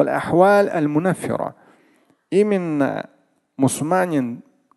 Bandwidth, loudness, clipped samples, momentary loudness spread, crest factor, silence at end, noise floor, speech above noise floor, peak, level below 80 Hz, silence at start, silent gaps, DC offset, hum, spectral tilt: 12.5 kHz; -19 LUFS; under 0.1%; 15 LU; 20 dB; 0.35 s; -58 dBFS; 40 dB; 0 dBFS; -60 dBFS; 0 s; none; under 0.1%; none; -6.5 dB/octave